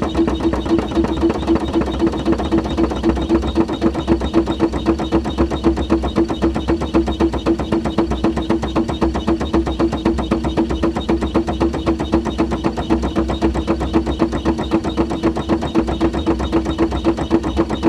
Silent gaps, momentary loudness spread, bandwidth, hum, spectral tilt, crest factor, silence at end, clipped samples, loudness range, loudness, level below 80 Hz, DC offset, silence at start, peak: none; 2 LU; 11 kHz; none; -7 dB/octave; 16 dB; 0 s; under 0.1%; 1 LU; -18 LUFS; -26 dBFS; under 0.1%; 0 s; -2 dBFS